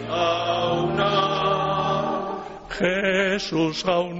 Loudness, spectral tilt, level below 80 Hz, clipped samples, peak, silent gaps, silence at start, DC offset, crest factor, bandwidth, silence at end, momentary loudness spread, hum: -23 LUFS; -3 dB/octave; -50 dBFS; under 0.1%; -10 dBFS; none; 0 s; under 0.1%; 14 dB; 8 kHz; 0 s; 6 LU; none